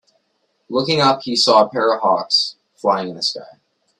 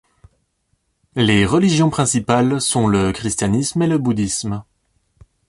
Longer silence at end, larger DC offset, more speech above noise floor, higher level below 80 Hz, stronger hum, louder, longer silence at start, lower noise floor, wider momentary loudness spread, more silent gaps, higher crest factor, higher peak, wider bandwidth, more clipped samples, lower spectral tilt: second, 0.55 s vs 0.85 s; neither; about the same, 50 dB vs 51 dB; second, -64 dBFS vs -42 dBFS; neither; about the same, -17 LUFS vs -17 LUFS; second, 0.7 s vs 1.15 s; about the same, -67 dBFS vs -67 dBFS; first, 10 LU vs 7 LU; neither; about the same, 18 dB vs 16 dB; about the same, 0 dBFS vs -2 dBFS; about the same, 11.5 kHz vs 11.5 kHz; neither; second, -3.5 dB/octave vs -5 dB/octave